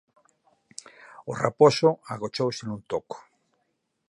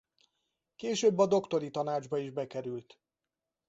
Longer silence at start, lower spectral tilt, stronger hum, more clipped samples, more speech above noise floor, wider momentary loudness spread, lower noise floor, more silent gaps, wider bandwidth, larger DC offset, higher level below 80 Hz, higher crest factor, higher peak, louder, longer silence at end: first, 1.2 s vs 0.8 s; about the same, -5.5 dB/octave vs -5 dB/octave; neither; neither; second, 51 dB vs 59 dB; first, 25 LU vs 14 LU; second, -76 dBFS vs -90 dBFS; neither; first, 11.5 kHz vs 8 kHz; neither; first, -66 dBFS vs -76 dBFS; about the same, 24 dB vs 20 dB; first, -4 dBFS vs -12 dBFS; first, -25 LUFS vs -32 LUFS; about the same, 0.9 s vs 0.85 s